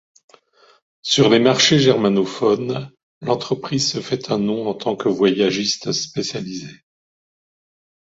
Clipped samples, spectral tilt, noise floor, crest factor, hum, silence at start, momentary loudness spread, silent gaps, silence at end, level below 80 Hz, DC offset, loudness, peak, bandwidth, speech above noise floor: under 0.1%; -4.5 dB/octave; -53 dBFS; 18 dB; none; 1.05 s; 16 LU; 3.03-3.21 s; 1.3 s; -60 dBFS; under 0.1%; -18 LUFS; -2 dBFS; 8 kHz; 34 dB